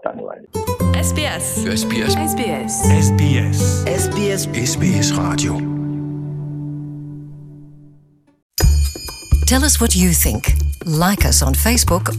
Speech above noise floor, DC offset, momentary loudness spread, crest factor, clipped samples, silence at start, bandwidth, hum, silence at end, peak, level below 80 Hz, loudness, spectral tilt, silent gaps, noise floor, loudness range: 35 dB; under 0.1%; 14 LU; 16 dB; under 0.1%; 0.05 s; 16 kHz; none; 0 s; -2 dBFS; -24 dBFS; -17 LUFS; -4.5 dB/octave; 8.42-8.50 s; -50 dBFS; 8 LU